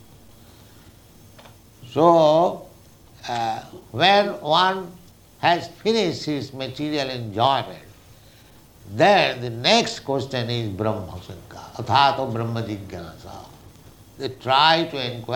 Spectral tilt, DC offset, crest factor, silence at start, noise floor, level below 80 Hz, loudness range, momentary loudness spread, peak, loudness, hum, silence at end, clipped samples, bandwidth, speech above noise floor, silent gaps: -5 dB/octave; under 0.1%; 22 dB; 1.4 s; -49 dBFS; -56 dBFS; 5 LU; 21 LU; -2 dBFS; -21 LUFS; none; 0 s; under 0.1%; 19.5 kHz; 28 dB; none